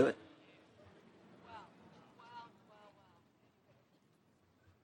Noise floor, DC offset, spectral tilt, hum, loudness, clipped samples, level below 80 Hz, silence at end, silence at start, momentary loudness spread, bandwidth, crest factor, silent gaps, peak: -72 dBFS; under 0.1%; -6.5 dB/octave; none; -45 LUFS; under 0.1%; -86 dBFS; 2.4 s; 0 s; 11 LU; 16 kHz; 28 dB; none; -16 dBFS